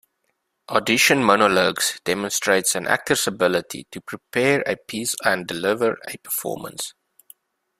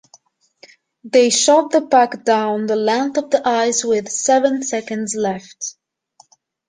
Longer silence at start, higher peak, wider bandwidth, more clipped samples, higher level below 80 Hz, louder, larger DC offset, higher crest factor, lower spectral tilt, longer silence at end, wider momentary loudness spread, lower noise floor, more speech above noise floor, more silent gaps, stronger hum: second, 0.7 s vs 1.05 s; about the same, -2 dBFS vs -2 dBFS; first, 16 kHz vs 10 kHz; neither; about the same, -62 dBFS vs -66 dBFS; second, -20 LUFS vs -17 LUFS; neither; first, 22 dB vs 16 dB; about the same, -2.5 dB/octave vs -2.5 dB/octave; about the same, 0.9 s vs 0.95 s; first, 15 LU vs 10 LU; first, -73 dBFS vs -54 dBFS; first, 52 dB vs 38 dB; neither; neither